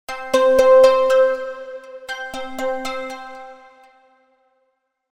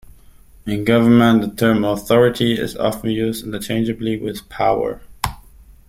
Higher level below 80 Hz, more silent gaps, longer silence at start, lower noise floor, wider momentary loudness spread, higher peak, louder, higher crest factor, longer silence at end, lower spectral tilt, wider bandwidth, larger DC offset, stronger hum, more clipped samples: second, -52 dBFS vs -42 dBFS; neither; second, 0.1 s vs 0.65 s; first, -70 dBFS vs -45 dBFS; first, 23 LU vs 13 LU; about the same, 0 dBFS vs -2 dBFS; about the same, -17 LUFS vs -18 LUFS; about the same, 18 dB vs 16 dB; first, 1.55 s vs 0.5 s; second, -2.5 dB/octave vs -6 dB/octave; second, 14.5 kHz vs 16.5 kHz; neither; neither; neither